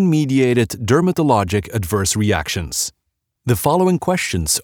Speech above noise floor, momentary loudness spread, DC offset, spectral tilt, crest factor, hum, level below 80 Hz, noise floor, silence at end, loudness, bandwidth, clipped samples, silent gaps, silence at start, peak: 57 dB; 6 LU; under 0.1%; -5 dB/octave; 16 dB; none; -42 dBFS; -74 dBFS; 0 s; -17 LUFS; over 20 kHz; under 0.1%; none; 0 s; -2 dBFS